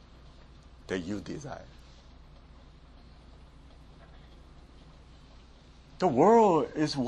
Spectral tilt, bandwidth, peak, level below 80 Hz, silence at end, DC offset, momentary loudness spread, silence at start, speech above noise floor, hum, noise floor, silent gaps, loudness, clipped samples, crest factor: -6.5 dB/octave; 10.5 kHz; -10 dBFS; -54 dBFS; 0 s; under 0.1%; 20 LU; 0.9 s; 28 dB; none; -54 dBFS; none; -26 LUFS; under 0.1%; 20 dB